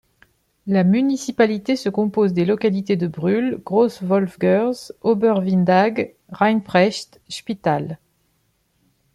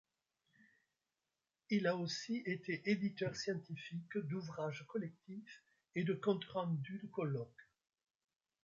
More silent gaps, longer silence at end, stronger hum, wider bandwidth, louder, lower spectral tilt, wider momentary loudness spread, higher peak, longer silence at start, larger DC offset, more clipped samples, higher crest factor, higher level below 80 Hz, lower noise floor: neither; first, 1.2 s vs 1 s; neither; first, 12 kHz vs 7.6 kHz; first, -19 LUFS vs -41 LUFS; about the same, -6.5 dB/octave vs -5.5 dB/octave; about the same, 11 LU vs 11 LU; first, -4 dBFS vs -22 dBFS; second, 0.65 s vs 1.7 s; neither; neither; about the same, 16 dB vs 20 dB; first, -62 dBFS vs -82 dBFS; second, -66 dBFS vs under -90 dBFS